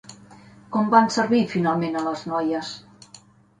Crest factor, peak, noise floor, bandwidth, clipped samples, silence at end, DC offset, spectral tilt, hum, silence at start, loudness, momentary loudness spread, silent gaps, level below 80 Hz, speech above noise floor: 20 dB; -4 dBFS; -51 dBFS; 10.5 kHz; under 0.1%; 0.45 s; under 0.1%; -5.5 dB/octave; 50 Hz at -45 dBFS; 0.1 s; -22 LUFS; 11 LU; none; -64 dBFS; 30 dB